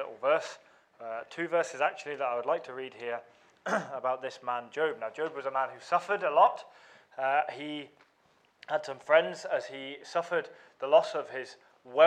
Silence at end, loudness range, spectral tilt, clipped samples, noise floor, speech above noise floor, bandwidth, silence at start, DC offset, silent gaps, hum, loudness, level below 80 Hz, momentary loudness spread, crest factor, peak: 0 s; 4 LU; -3.5 dB/octave; under 0.1%; -68 dBFS; 37 dB; 9.8 kHz; 0 s; under 0.1%; none; none; -31 LUFS; -86 dBFS; 16 LU; 22 dB; -8 dBFS